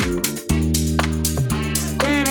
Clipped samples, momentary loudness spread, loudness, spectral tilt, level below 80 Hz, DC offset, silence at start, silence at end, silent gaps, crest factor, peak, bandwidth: under 0.1%; 3 LU; -20 LUFS; -4.5 dB/octave; -28 dBFS; under 0.1%; 0 s; 0 s; none; 16 dB; -4 dBFS; over 20 kHz